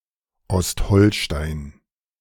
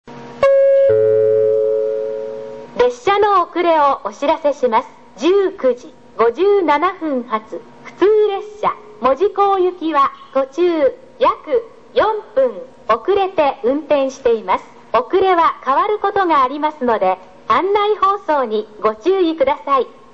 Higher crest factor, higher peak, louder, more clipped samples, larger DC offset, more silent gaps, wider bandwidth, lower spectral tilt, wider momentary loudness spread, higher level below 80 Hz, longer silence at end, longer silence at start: about the same, 18 dB vs 14 dB; about the same, -2 dBFS vs -2 dBFS; second, -20 LUFS vs -16 LUFS; neither; second, under 0.1% vs 0.5%; neither; first, 17.5 kHz vs 7.8 kHz; about the same, -5.5 dB/octave vs -5.5 dB/octave; first, 15 LU vs 8 LU; first, -32 dBFS vs -54 dBFS; first, 0.5 s vs 0.25 s; first, 0.5 s vs 0.05 s